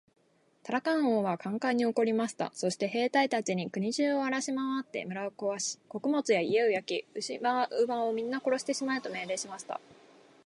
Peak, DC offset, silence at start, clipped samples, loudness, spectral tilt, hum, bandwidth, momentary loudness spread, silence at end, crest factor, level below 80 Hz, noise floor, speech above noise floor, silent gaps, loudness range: -14 dBFS; under 0.1%; 0.65 s; under 0.1%; -31 LUFS; -4 dB/octave; none; 11.5 kHz; 8 LU; 0.55 s; 18 dB; -82 dBFS; -61 dBFS; 30 dB; none; 2 LU